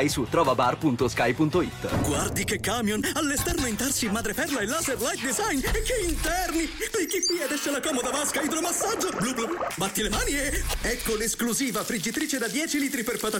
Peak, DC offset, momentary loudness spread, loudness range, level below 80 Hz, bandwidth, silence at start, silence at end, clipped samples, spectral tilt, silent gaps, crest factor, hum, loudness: -10 dBFS; under 0.1%; 4 LU; 1 LU; -40 dBFS; 17 kHz; 0 s; 0 s; under 0.1%; -3 dB/octave; none; 16 dB; none; -26 LUFS